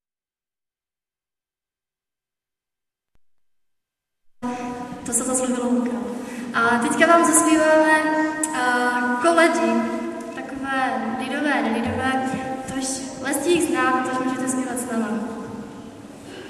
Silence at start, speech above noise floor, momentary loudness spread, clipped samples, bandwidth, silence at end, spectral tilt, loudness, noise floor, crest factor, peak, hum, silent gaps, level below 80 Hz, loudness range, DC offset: 4.4 s; over 70 dB; 16 LU; under 0.1%; 14 kHz; 0 s; -3 dB/octave; -21 LUFS; under -90 dBFS; 22 dB; -2 dBFS; none; none; -58 dBFS; 9 LU; under 0.1%